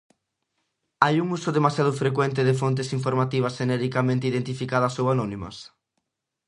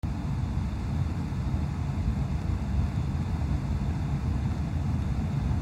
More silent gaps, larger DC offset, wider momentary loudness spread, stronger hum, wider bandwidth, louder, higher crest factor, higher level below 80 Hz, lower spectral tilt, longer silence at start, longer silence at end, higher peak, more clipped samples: neither; neither; first, 5 LU vs 2 LU; neither; about the same, 11 kHz vs 11 kHz; first, -24 LUFS vs -30 LUFS; first, 24 dB vs 14 dB; second, -60 dBFS vs -34 dBFS; second, -6.5 dB/octave vs -8 dB/octave; first, 1 s vs 0.05 s; first, 0.8 s vs 0 s; first, 0 dBFS vs -16 dBFS; neither